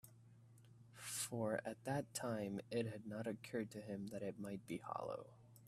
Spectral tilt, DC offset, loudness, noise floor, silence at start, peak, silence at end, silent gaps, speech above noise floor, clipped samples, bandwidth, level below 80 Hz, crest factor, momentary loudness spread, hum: -5 dB/octave; under 0.1%; -46 LUFS; -65 dBFS; 0.05 s; -28 dBFS; 0 s; none; 20 dB; under 0.1%; 15 kHz; -80 dBFS; 20 dB; 21 LU; none